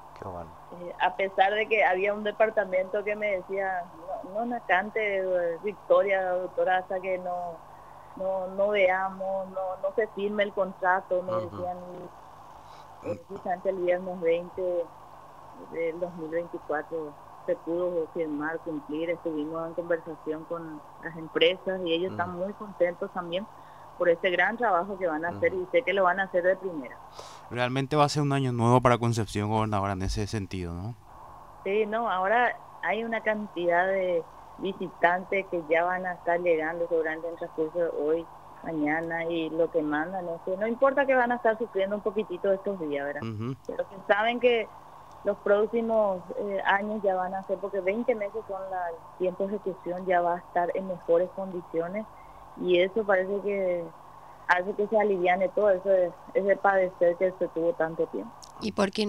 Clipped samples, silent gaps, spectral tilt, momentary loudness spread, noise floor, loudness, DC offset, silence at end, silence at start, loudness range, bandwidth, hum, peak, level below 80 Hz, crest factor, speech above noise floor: under 0.1%; none; -6 dB/octave; 14 LU; -48 dBFS; -28 LUFS; 0.1%; 0 s; 0 s; 6 LU; 12.5 kHz; 50 Hz at -60 dBFS; -8 dBFS; -56 dBFS; 20 dB; 21 dB